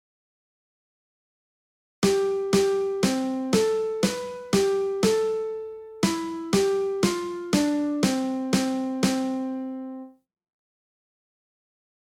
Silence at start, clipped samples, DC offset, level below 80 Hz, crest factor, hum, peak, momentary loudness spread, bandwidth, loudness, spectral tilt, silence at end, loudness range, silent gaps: 2 s; under 0.1%; under 0.1%; -58 dBFS; 18 dB; none; -8 dBFS; 10 LU; 16.5 kHz; -25 LUFS; -5 dB/octave; 1.95 s; 5 LU; none